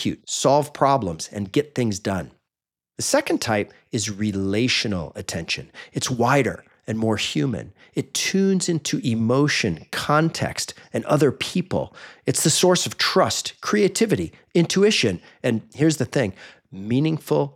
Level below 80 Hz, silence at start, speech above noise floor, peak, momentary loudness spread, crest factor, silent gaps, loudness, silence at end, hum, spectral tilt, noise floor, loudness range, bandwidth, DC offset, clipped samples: -58 dBFS; 0 s; 67 dB; -4 dBFS; 10 LU; 18 dB; none; -22 LUFS; 0.05 s; none; -4.5 dB/octave; -89 dBFS; 4 LU; 17 kHz; under 0.1%; under 0.1%